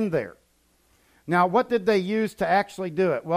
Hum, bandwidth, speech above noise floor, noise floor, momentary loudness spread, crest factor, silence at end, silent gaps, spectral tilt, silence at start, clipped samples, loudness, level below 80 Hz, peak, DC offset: none; 15.5 kHz; 41 dB; -64 dBFS; 8 LU; 16 dB; 0 s; none; -6.5 dB/octave; 0 s; under 0.1%; -24 LUFS; -62 dBFS; -8 dBFS; under 0.1%